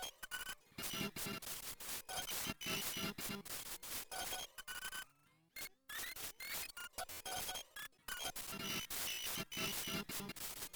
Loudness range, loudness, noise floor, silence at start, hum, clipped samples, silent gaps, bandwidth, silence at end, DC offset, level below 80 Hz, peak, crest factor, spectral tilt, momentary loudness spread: 4 LU; -44 LUFS; -73 dBFS; 0 s; none; under 0.1%; none; over 20 kHz; 0 s; under 0.1%; -66 dBFS; -28 dBFS; 18 dB; -1.5 dB/octave; 7 LU